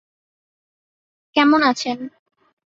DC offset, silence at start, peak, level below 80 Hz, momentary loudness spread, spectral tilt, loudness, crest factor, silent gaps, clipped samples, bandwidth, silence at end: under 0.1%; 1.35 s; -2 dBFS; -66 dBFS; 16 LU; -3 dB/octave; -17 LUFS; 20 dB; none; under 0.1%; 7.8 kHz; 0.7 s